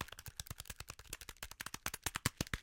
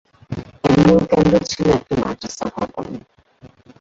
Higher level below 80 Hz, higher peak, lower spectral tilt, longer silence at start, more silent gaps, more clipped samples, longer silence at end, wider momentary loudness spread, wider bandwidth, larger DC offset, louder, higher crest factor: second, -56 dBFS vs -40 dBFS; second, -16 dBFS vs -2 dBFS; second, -2.5 dB/octave vs -6.5 dB/octave; second, 0 s vs 0.3 s; neither; neither; second, 0 s vs 0.35 s; second, 10 LU vs 19 LU; first, 17 kHz vs 7.8 kHz; neither; second, -44 LUFS vs -17 LUFS; first, 30 dB vs 16 dB